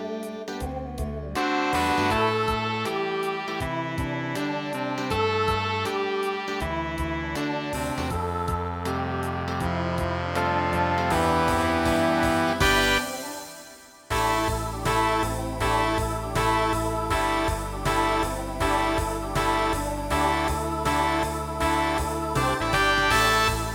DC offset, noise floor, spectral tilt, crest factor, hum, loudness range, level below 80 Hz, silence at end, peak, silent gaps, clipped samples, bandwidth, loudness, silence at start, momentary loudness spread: under 0.1%; -47 dBFS; -4.5 dB/octave; 18 dB; none; 5 LU; -38 dBFS; 0 s; -8 dBFS; none; under 0.1%; 19 kHz; -25 LUFS; 0 s; 7 LU